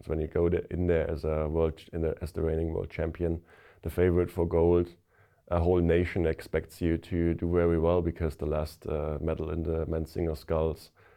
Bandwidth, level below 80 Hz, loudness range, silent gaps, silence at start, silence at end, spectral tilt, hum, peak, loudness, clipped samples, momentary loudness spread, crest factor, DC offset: 15 kHz; -44 dBFS; 3 LU; none; 0.05 s; 0.3 s; -8.5 dB/octave; none; -14 dBFS; -29 LUFS; under 0.1%; 8 LU; 16 dB; under 0.1%